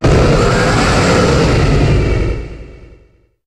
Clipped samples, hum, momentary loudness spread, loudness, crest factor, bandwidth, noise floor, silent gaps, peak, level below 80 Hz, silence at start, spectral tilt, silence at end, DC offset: under 0.1%; none; 9 LU; -12 LUFS; 12 dB; 12 kHz; -49 dBFS; none; 0 dBFS; -20 dBFS; 0 s; -6 dB/octave; 0.6 s; under 0.1%